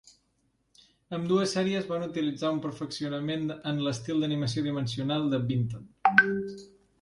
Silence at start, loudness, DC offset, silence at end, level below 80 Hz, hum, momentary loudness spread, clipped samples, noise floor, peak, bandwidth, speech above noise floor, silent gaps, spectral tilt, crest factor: 1.1 s; -29 LUFS; under 0.1%; 0.35 s; -64 dBFS; none; 12 LU; under 0.1%; -73 dBFS; -4 dBFS; 11.5 kHz; 44 dB; none; -5.5 dB/octave; 24 dB